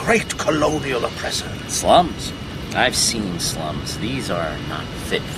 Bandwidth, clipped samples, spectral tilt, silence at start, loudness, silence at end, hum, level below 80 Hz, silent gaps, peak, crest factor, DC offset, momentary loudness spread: 15.5 kHz; under 0.1%; -3.5 dB/octave; 0 s; -21 LUFS; 0 s; none; -38 dBFS; none; -2 dBFS; 20 dB; under 0.1%; 12 LU